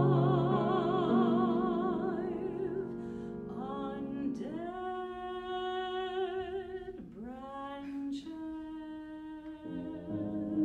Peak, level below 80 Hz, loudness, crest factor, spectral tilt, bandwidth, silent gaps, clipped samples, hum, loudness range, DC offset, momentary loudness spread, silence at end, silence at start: -16 dBFS; -62 dBFS; -35 LUFS; 18 dB; -9 dB/octave; 7.8 kHz; none; under 0.1%; none; 10 LU; under 0.1%; 15 LU; 0 s; 0 s